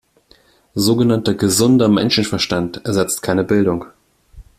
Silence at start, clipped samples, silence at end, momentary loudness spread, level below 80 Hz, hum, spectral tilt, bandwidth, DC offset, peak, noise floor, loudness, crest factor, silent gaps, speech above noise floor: 0.75 s; under 0.1%; 0.15 s; 7 LU; -48 dBFS; none; -5 dB/octave; 16 kHz; under 0.1%; -2 dBFS; -53 dBFS; -16 LUFS; 14 dB; none; 37 dB